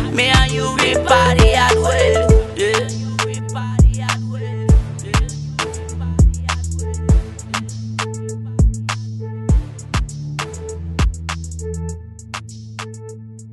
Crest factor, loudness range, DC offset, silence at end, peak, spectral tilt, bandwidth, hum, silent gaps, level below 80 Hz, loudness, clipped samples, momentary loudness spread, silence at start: 18 dB; 9 LU; under 0.1%; 0 s; 0 dBFS; -5 dB/octave; 12 kHz; none; none; -22 dBFS; -18 LUFS; under 0.1%; 16 LU; 0 s